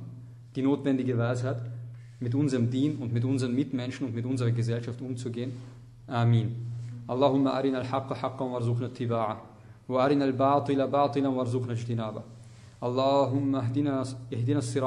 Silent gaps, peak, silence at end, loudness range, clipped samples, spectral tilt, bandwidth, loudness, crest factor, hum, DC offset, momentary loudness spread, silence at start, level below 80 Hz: none; -10 dBFS; 0 s; 3 LU; under 0.1%; -7.5 dB/octave; 10.5 kHz; -29 LUFS; 18 dB; none; under 0.1%; 13 LU; 0 s; -64 dBFS